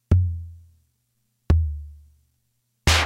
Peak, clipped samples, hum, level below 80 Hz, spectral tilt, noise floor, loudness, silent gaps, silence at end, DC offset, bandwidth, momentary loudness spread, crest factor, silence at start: -2 dBFS; under 0.1%; none; -30 dBFS; -4 dB/octave; -72 dBFS; -24 LUFS; none; 0 s; under 0.1%; 15.5 kHz; 20 LU; 22 dB; 0.1 s